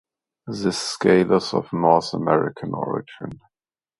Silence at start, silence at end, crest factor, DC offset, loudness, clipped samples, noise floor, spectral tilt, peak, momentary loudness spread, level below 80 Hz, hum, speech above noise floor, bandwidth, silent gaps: 0.45 s; 0.65 s; 22 dB; under 0.1%; -21 LUFS; under 0.1%; under -90 dBFS; -5.5 dB/octave; 0 dBFS; 18 LU; -58 dBFS; none; over 69 dB; 11.5 kHz; none